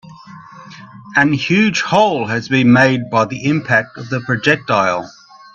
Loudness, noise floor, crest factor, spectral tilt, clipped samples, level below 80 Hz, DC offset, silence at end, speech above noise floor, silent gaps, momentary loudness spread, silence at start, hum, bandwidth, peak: -15 LUFS; -37 dBFS; 16 dB; -5.5 dB/octave; under 0.1%; -54 dBFS; under 0.1%; 0.45 s; 22 dB; none; 8 LU; 0.1 s; none; 8 kHz; 0 dBFS